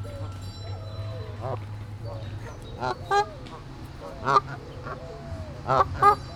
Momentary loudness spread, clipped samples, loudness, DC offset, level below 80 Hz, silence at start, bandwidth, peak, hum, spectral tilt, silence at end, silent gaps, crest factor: 16 LU; under 0.1%; -28 LUFS; under 0.1%; -46 dBFS; 0 s; 16.5 kHz; -6 dBFS; none; -6 dB/octave; 0 s; none; 22 dB